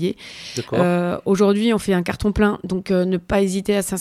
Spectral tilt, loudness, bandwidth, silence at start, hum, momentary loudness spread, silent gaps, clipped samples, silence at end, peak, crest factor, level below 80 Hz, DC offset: -6 dB/octave; -20 LUFS; 15 kHz; 0 s; none; 9 LU; none; under 0.1%; 0 s; -4 dBFS; 14 dB; -40 dBFS; under 0.1%